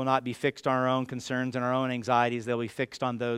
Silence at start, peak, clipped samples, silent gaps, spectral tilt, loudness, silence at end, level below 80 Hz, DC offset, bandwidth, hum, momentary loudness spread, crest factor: 0 s; -10 dBFS; under 0.1%; none; -6 dB/octave; -29 LUFS; 0 s; -70 dBFS; under 0.1%; 13.5 kHz; none; 6 LU; 18 dB